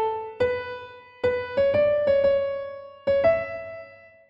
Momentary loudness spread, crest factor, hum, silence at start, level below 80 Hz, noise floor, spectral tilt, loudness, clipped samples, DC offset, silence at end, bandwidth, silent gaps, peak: 17 LU; 14 dB; none; 0 s; -54 dBFS; -46 dBFS; -7 dB/octave; -24 LUFS; under 0.1%; under 0.1%; 0.35 s; 5.6 kHz; none; -10 dBFS